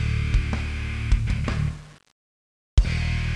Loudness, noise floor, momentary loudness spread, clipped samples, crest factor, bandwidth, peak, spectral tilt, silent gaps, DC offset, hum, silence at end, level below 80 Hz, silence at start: -26 LUFS; under -90 dBFS; 5 LU; under 0.1%; 20 dB; 10.5 kHz; -4 dBFS; -6 dB/octave; 2.12-2.77 s; under 0.1%; none; 0 s; -26 dBFS; 0 s